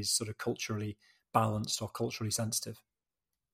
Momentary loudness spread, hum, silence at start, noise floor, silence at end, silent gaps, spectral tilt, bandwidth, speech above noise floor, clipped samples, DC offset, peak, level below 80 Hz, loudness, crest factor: 12 LU; none; 0 s; under -90 dBFS; 0.75 s; none; -3.5 dB/octave; 16 kHz; over 55 dB; under 0.1%; under 0.1%; -12 dBFS; -68 dBFS; -34 LUFS; 24 dB